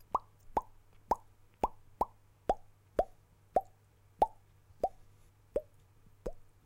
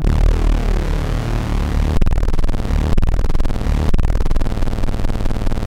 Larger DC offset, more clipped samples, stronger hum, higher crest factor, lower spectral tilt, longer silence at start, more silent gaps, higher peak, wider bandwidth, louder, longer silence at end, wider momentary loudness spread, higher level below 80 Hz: neither; neither; neither; first, 24 dB vs 10 dB; about the same, -6.5 dB/octave vs -7 dB/octave; first, 0.15 s vs 0 s; neither; second, -14 dBFS vs -4 dBFS; first, 16.5 kHz vs 9.8 kHz; second, -39 LUFS vs -21 LUFS; first, 0.25 s vs 0 s; first, 8 LU vs 4 LU; second, -54 dBFS vs -16 dBFS